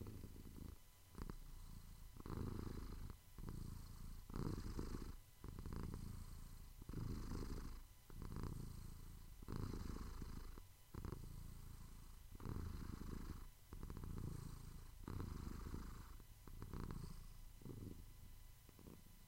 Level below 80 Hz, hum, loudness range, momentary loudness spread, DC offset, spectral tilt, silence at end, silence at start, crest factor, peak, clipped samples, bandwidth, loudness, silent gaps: -54 dBFS; none; 2 LU; 11 LU; under 0.1%; -6.5 dB/octave; 0 s; 0 s; 20 dB; -32 dBFS; under 0.1%; 16 kHz; -55 LUFS; none